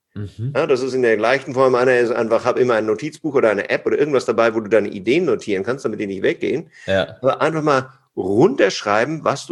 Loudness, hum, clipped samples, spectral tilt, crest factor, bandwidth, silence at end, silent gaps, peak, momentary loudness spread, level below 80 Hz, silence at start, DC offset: -18 LUFS; none; under 0.1%; -5.5 dB/octave; 18 dB; 11 kHz; 0.05 s; none; -2 dBFS; 8 LU; -60 dBFS; 0.15 s; under 0.1%